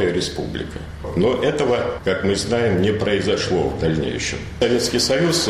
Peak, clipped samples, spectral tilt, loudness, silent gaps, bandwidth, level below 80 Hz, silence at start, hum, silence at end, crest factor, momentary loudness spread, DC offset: -4 dBFS; under 0.1%; -4.5 dB/octave; -20 LUFS; none; 15 kHz; -38 dBFS; 0 s; none; 0 s; 16 dB; 9 LU; under 0.1%